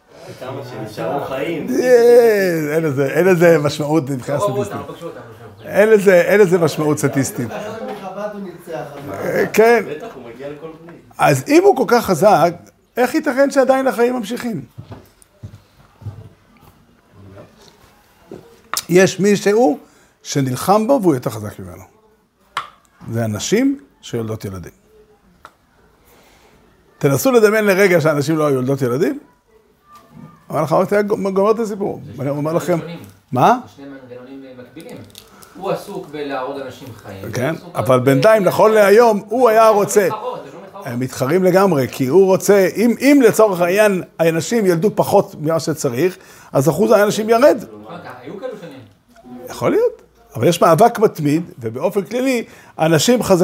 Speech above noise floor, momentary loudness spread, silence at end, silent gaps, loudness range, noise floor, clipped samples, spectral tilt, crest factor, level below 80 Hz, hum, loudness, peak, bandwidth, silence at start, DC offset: 40 dB; 21 LU; 0 s; none; 10 LU; -55 dBFS; under 0.1%; -5.5 dB/octave; 16 dB; -56 dBFS; none; -15 LUFS; 0 dBFS; 16 kHz; 0.2 s; under 0.1%